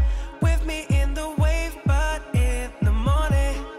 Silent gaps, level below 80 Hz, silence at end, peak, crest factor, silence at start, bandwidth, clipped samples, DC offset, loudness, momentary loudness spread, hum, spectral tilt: none; -24 dBFS; 0 s; -10 dBFS; 10 dB; 0 s; 14 kHz; under 0.1%; under 0.1%; -24 LUFS; 4 LU; none; -6 dB/octave